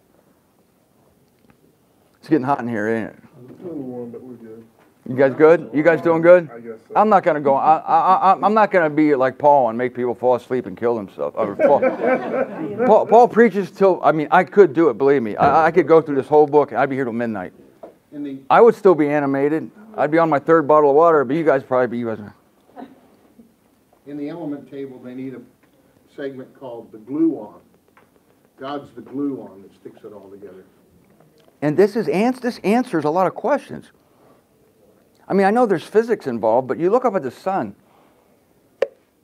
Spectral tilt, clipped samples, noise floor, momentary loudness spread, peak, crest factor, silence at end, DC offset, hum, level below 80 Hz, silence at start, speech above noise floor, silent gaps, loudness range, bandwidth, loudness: -7.5 dB/octave; under 0.1%; -59 dBFS; 20 LU; 0 dBFS; 18 dB; 0.35 s; under 0.1%; none; -66 dBFS; 2.3 s; 41 dB; none; 17 LU; 12.5 kHz; -17 LUFS